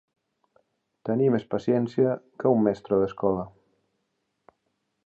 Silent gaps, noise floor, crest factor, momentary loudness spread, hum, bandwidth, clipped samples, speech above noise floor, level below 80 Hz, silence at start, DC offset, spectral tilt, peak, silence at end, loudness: none; -77 dBFS; 18 dB; 8 LU; none; 7.4 kHz; under 0.1%; 53 dB; -62 dBFS; 1.05 s; under 0.1%; -9.5 dB/octave; -8 dBFS; 1.6 s; -25 LUFS